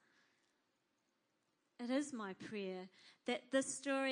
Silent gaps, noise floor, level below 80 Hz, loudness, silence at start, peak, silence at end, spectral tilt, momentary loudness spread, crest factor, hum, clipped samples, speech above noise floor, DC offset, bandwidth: none; -84 dBFS; under -90 dBFS; -43 LUFS; 1.8 s; -24 dBFS; 0 s; -3 dB/octave; 12 LU; 22 dB; none; under 0.1%; 42 dB; under 0.1%; 10.5 kHz